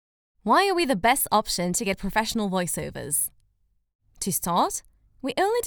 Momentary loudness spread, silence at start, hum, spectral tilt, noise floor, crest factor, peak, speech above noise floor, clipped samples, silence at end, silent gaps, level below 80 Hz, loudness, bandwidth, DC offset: 10 LU; 0.45 s; none; -3 dB/octave; -68 dBFS; 20 dB; -6 dBFS; 44 dB; under 0.1%; 0 s; 3.95-3.99 s; -50 dBFS; -24 LUFS; over 20 kHz; under 0.1%